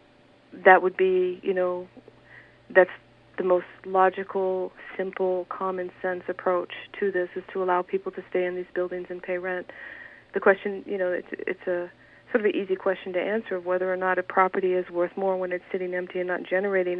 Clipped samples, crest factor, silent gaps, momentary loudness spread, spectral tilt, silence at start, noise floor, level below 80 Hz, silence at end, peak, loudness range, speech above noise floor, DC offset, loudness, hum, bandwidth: under 0.1%; 26 dB; none; 11 LU; -8.5 dB/octave; 0.55 s; -57 dBFS; -70 dBFS; 0 s; 0 dBFS; 5 LU; 31 dB; under 0.1%; -26 LUFS; none; 4.5 kHz